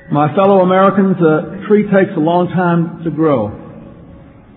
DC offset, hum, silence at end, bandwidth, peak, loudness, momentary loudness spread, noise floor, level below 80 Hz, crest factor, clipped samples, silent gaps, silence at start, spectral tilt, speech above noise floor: under 0.1%; none; 0.4 s; 4.1 kHz; 0 dBFS; -13 LUFS; 7 LU; -38 dBFS; -50 dBFS; 14 dB; under 0.1%; none; 0.1 s; -12 dB/octave; 26 dB